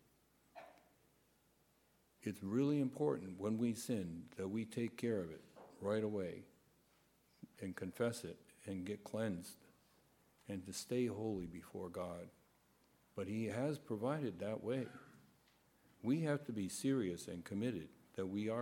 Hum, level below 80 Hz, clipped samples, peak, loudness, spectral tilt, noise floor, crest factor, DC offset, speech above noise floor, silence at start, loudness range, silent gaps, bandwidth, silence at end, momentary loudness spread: none; -76 dBFS; under 0.1%; -24 dBFS; -43 LUFS; -6 dB/octave; -75 dBFS; 18 dB; under 0.1%; 34 dB; 0.55 s; 5 LU; none; 17 kHz; 0 s; 17 LU